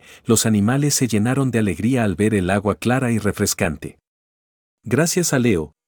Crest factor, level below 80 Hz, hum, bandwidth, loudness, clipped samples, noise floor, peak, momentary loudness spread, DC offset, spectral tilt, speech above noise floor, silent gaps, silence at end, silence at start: 16 dB; -46 dBFS; none; 19.5 kHz; -19 LUFS; under 0.1%; under -90 dBFS; -2 dBFS; 4 LU; under 0.1%; -5 dB/octave; over 71 dB; 4.07-4.78 s; 0.2 s; 0.1 s